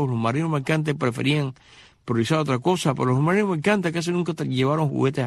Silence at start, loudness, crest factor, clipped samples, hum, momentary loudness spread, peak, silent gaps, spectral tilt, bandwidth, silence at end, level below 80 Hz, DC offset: 0 s; -23 LUFS; 16 dB; under 0.1%; none; 4 LU; -6 dBFS; none; -6.5 dB/octave; 12.5 kHz; 0 s; -60 dBFS; under 0.1%